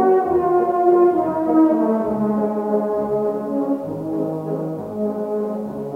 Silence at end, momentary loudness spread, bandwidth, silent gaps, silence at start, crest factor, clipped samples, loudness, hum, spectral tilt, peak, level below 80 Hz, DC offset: 0 s; 10 LU; 3.5 kHz; none; 0 s; 14 dB; under 0.1%; -20 LUFS; none; -10 dB/octave; -4 dBFS; -56 dBFS; under 0.1%